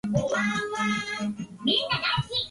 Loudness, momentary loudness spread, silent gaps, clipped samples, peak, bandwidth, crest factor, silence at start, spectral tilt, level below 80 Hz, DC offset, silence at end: -26 LUFS; 7 LU; none; under 0.1%; -10 dBFS; 11.5 kHz; 16 dB; 0.05 s; -4.5 dB/octave; -54 dBFS; under 0.1%; 0 s